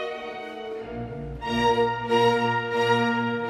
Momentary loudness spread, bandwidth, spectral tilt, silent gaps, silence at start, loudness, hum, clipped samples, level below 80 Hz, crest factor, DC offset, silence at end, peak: 14 LU; 13 kHz; -5.5 dB/octave; none; 0 s; -24 LUFS; none; under 0.1%; -48 dBFS; 16 dB; under 0.1%; 0 s; -10 dBFS